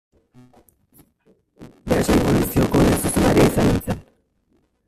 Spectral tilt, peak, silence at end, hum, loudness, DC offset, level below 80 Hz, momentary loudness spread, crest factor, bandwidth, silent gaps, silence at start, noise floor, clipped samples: -6 dB/octave; -4 dBFS; 0.85 s; none; -18 LUFS; under 0.1%; -34 dBFS; 12 LU; 16 dB; 16 kHz; none; 1.6 s; -64 dBFS; under 0.1%